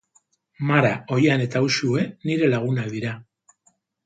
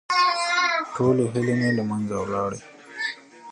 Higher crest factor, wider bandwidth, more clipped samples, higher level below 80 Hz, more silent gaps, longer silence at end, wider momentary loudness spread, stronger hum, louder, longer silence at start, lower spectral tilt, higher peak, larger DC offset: about the same, 20 dB vs 16 dB; second, 9.2 kHz vs 10.5 kHz; neither; second, -64 dBFS vs -58 dBFS; neither; first, 0.85 s vs 0 s; about the same, 10 LU vs 10 LU; neither; about the same, -22 LUFS vs -23 LUFS; first, 0.6 s vs 0.1 s; about the same, -6 dB/octave vs -5 dB/octave; first, -4 dBFS vs -8 dBFS; neither